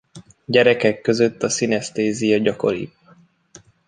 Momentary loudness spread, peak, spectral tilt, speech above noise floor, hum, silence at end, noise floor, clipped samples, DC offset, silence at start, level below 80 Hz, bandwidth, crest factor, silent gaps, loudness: 9 LU; -2 dBFS; -4.5 dB/octave; 35 dB; none; 1 s; -53 dBFS; under 0.1%; under 0.1%; 0.15 s; -58 dBFS; 9.8 kHz; 18 dB; none; -19 LUFS